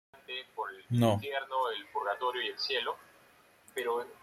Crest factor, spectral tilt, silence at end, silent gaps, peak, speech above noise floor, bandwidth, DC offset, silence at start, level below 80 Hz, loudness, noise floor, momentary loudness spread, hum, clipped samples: 22 dB; -5.5 dB/octave; 0.05 s; none; -14 dBFS; 30 dB; 15.5 kHz; under 0.1%; 0.15 s; -72 dBFS; -34 LUFS; -62 dBFS; 12 LU; none; under 0.1%